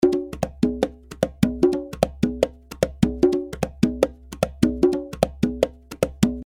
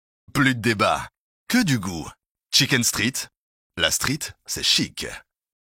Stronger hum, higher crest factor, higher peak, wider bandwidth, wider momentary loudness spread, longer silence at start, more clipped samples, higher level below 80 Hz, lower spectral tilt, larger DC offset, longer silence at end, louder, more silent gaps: neither; about the same, 22 dB vs 22 dB; about the same, 0 dBFS vs -2 dBFS; about the same, 17 kHz vs 16.5 kHz; second, 8 LU vs 16 LU; second, 0 s vs 0.35 s; neither; first, -40 dBFS vs -52 dBFS; first, -6.5 dB/octave vs -3 dB/octave; neither; second, 0.05 s vs 0.55 s; about the same, -23 LUFS vs -21 LUFS; second, none vs 1.18-1.46 s, 2.26-2.35 s, 3.37-3.70 s